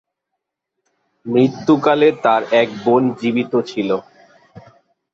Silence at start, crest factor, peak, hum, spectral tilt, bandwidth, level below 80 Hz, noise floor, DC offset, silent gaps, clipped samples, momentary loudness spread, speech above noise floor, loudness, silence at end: 1.25 s; 16 dB; -2 dBFS; none; -7 dB/octave; 7.6 kHz; -62 dBFS; -79 dBFS; under 0.1%; none; under 0.1%; 7 LU; 63 dB; -16 LUFS; 0.55 s